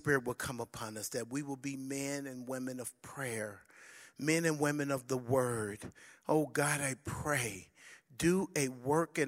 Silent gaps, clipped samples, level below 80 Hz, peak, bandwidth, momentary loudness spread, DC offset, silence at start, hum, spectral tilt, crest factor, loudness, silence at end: none; under 0.1%; -66 dBFS; -16 dBFS; 16 kHz; 16 LU; under 0.1%; 0.05 s; none; -4.5 dB/octave; 20 dB; -36 LUFS; 0 s